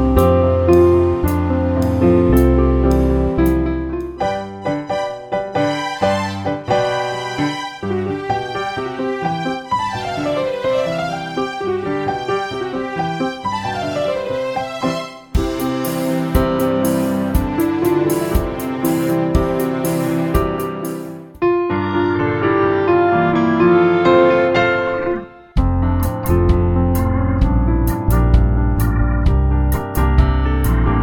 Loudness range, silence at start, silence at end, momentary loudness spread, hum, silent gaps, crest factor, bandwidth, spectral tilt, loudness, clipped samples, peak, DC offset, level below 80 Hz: 7 LU; 0 s; 0 s; 9 LU; none; none; 16 dB; 19.5 kHz; -7 dB/octave; -17 LUFS; under 0.1%; 0 dBFS; under 0.1%; -24 dBFS